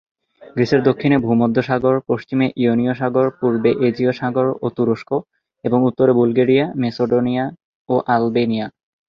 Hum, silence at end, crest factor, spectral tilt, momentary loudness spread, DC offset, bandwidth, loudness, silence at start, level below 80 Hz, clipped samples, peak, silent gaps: none; 0.4 s; 16 dB; -8.5 dB/octave; 7 LU; under 0.1%; 6.6 kHz; -18 LUFS; 0.45 s; -56 dBFS; under 0.1%; -2 dBFS; 7.64-7.85 s